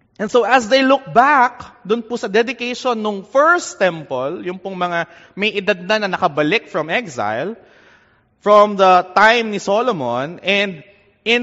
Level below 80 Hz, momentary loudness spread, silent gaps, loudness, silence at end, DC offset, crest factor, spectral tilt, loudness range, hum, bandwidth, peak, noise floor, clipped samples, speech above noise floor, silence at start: -60 dBFS; 11 LU; none; -16 LUFS; 0 s; under 0.1%; 16 dB; -2 dB/octave; 4 LU; none; 8 kHz; 0 dBFS; -54 dBFS; under 0.1%; 37 dB; 0.2 s